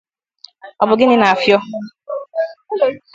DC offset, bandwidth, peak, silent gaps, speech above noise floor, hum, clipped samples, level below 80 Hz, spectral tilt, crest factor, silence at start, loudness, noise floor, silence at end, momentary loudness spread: under 0.1%; 7.8 kHz; 0 dBFS; none; 31 dB; none; under 0.1%; -60 dBFS; -5.5 dB/octave; 16 dB; 0.65 s; -15 LUFS; -46 dBFS; 0.15 s; 16 LU